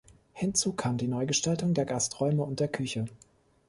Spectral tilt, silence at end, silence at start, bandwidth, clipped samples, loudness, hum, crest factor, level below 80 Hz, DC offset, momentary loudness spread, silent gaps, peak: -4.5 dB/octave; 0.5 s; 0.35 s; 11.5 kHz; under 0.1%; -29 LUFS; none; 18 dB; -60 dBFS; under 0.1%; 6 LU; none; -14 dBFS